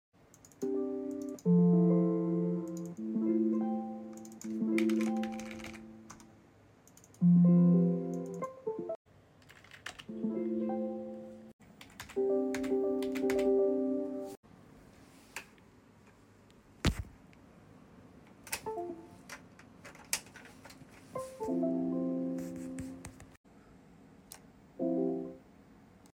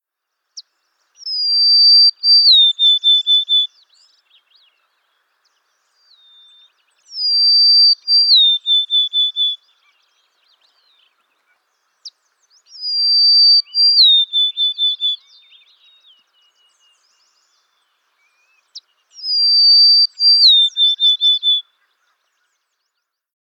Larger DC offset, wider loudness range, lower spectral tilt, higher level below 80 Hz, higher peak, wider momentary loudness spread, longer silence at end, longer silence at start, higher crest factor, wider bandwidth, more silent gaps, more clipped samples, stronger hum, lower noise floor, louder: neither; about the same, 12 LU vs 12 LU; first, -7 dB/octave vs 6 dB/octave; first, -58 dBFS vs under -90 dBFS; second, -12 dBFS vs -2 dBFS; first, 25 LU vs 12 LU; second, 0.75 s vs 1.9 s; about the same, 0.6 s vs 0.55 s; first, 22 dB vs 14 dB; about the same, 16 kHz vs 15 kHz; first, 8.96-9.05 s, 11.53-11.59 s, 14.37-14.43 s, 23.37-23.44 s vs none; neither; neither; second, -61 dBFS vs -77 dBFS; second, -33 LUFS vs -10 LUFS